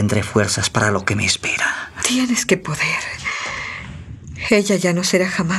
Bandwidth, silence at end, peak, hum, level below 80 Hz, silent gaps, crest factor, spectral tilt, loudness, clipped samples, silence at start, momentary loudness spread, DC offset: 14.5 kHz; 0 s; -2 dBFS; none; -48 dBFS; none; 18 dB; -3.5 dB/octave; -18 LUFS; under 0.1%; 0 s; 10 LU; under 0.1%